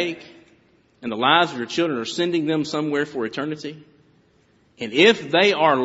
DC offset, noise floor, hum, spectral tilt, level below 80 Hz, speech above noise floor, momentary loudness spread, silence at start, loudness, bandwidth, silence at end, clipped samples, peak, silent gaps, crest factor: under 0.1%; -59 dBFS; none; -2 dB/octave; -68 dBFS; 39 dB; 17 LU; 0 s; -20 LUFS; 8 kHz; 0 s; under 0.1%; 0 dBFS; none; 22 dB